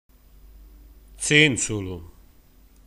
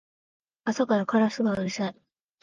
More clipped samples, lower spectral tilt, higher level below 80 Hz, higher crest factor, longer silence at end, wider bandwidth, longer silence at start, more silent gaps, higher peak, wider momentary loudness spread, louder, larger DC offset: neither; second, -3 dB/octave vs -6 dB/octave; first, -48 dBFS vs -66 dBFS; first, 24 dB vs 16 dB; first, 0.8 s vs 0.5 s; first, 15.5 kHz vs 7.6 kHz; about the same, 0.6 s vs 0.65 s; neither; first, -2 dBFS vs -10 dBFS; first, 19 LU vs 9 LU; first, -20 LUFS vs -27 LUFS; neither